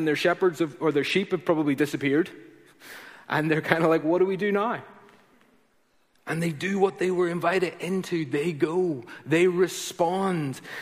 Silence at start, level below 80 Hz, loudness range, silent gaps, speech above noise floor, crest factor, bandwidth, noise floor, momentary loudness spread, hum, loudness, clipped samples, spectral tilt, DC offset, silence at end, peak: 0 s; -70 dBFS; 3 LU; none; 40 dB; 22 dB; 15.5 kHz; -65 dBFS; 11 LU; none; -25 LUFS; under 0.1%; -5.5 dB/octave; under 0.1%; 0 s; -4 dBFS